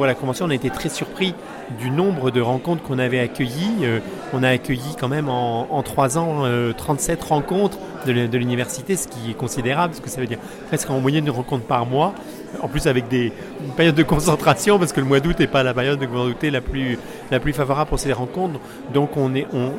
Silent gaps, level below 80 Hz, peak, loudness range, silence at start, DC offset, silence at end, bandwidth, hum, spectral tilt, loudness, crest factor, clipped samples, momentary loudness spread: none; -40 dBFS; -4 dBFS; 4 LU; 0 s; under 0.1%; 0 s; 17 kHz; none; -5.5 dB/octave; -21 LUFS; 18 dB; under 0.1%; 9 LU